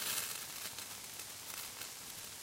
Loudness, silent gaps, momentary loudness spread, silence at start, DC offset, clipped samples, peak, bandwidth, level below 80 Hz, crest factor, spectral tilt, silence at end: -42 LUFS; none; 7 LU; 0 s; under 0.1%; under 0.1%; -20 dBFS; 16.5 kHz; -74 dBFS; 24 dB; 0.5 dB/octave; 0 s